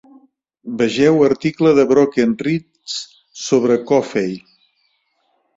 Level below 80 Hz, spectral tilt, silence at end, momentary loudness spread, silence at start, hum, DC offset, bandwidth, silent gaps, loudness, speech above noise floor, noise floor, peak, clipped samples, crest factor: -58 dBFS; -5.5 dB/octave; 1.2 s; 16 LU; 0.65 s; none; under 0.1%; 7.8 kHz; none; -16 LUFS; 50 dB; -65 dBFS; -2 dBFS; under 0.1%; 16 dB